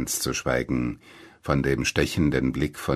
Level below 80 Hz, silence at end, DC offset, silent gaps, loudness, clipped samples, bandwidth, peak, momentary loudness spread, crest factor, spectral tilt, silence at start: -40 dBFS; 0 s; under 0.1%; none; -25 LUFS; under 0.1%; 13.5 kHz; -6 dBFS; 7 LU; 18 dB; -4.5 dB/octave; 0 s